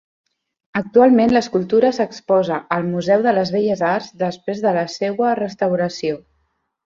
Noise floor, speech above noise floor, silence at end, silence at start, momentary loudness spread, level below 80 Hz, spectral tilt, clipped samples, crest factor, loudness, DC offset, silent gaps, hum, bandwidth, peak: -68 dBFS; 51 dB; 0.7 s; 0.75 s; 10 LU; -58 dBFS; -6.5 dB/octave; under 0.1%; 16 dB; -18 LUFS; under 0.1%; none; none; 7.6 kHz; -2 dBFS